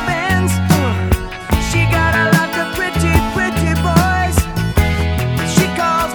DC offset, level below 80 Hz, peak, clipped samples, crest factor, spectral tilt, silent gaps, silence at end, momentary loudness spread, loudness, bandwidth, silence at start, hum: under 0.1%; -24 dBFS; 0 dBFS; under 0.1%; 14 dB; -5 dB/octave; none; 0 s; 5 LU; -15 LUFS; over 20 kHz; 0 s; none